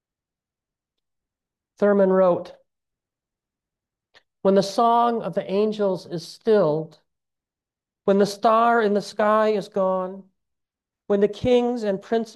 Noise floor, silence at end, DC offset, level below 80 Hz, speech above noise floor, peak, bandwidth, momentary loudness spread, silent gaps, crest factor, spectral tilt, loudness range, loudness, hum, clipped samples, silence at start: -90 dBFS; 0.05 s; under 0.1%; -62 dBFS; 69 dB; -6 dBFS; 12.5 kHz; 10 LU; none; 16 dB; -6.5 dB/octave; 3 LU; -21 LUFS; none; under 0.1%; 1.8 s